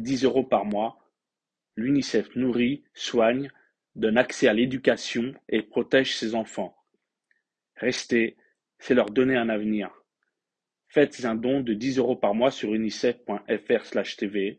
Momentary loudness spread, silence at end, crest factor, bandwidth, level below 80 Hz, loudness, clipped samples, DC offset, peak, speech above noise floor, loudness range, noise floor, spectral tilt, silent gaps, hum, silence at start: 8 LU; 0.05 s; 20 dB; 9.2 kHz; -64 dBFS; -25 LUFS; under 0.1%; under 0.1%; -6 dBFS; 64 dB; 3 LU; -88 dBFS; -5 dB/octave; none; none; 0 s